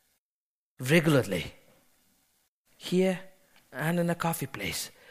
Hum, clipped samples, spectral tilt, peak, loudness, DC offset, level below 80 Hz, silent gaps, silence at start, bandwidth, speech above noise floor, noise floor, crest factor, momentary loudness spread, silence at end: none; under 0.1%; -5.5 dB/octave; -8 dBFS; -29 LUFS; under 0.1%; -60 dBFS; 2.48-2.65 s; 0.8 s; 15.5 kHz; over 62 dB; under -90 dBFS; 22 dB; 14 LU; 0.25 s